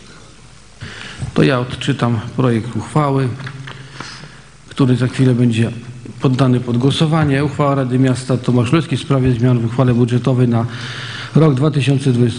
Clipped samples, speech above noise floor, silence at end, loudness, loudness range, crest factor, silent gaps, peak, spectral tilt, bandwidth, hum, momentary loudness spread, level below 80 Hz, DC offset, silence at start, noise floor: under 0.1%; 28 dB; 0 s; -15 LUFS; 4 LU; 16 dB; none; 0 dBFS; -7 dB/octave; 10.5 kHz; none; 17 LU; -44 dBFS; 0.4%; 0.1 s; -42 dBFS